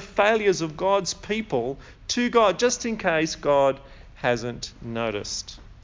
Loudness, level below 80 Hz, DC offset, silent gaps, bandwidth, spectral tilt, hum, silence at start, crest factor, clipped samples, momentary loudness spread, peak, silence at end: -24 LUFS; -48 dBFS; under 0.1%; none; 7.6 kHz; -3.5 dB/octave; none; 0 s; 18 dB; under 0.1%; 13 LU; -6 dBFS; 0.05 s